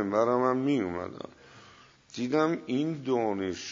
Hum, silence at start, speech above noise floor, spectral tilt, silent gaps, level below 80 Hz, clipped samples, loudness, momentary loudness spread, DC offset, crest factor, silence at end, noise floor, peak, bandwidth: none; 0 s; 27 dB; -6 dB/octave; none; -68 dBFS; under 0.1%; -29 LUFS; 15 LU; under 0.1%; 18 dB; 0 s; -56 dBFS; -12 dBFS; 7.6 kHz